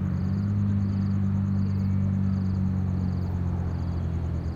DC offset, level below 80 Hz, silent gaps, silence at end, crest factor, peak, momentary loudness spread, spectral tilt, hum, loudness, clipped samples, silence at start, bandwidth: under 0.1%; -40 dBFS; none; 0 s; 10 dB; -16 dBFS; 4 LU; -10 dB/octave; none; -27 LUFS; under 0.1%; 0 s; 6.8 kHz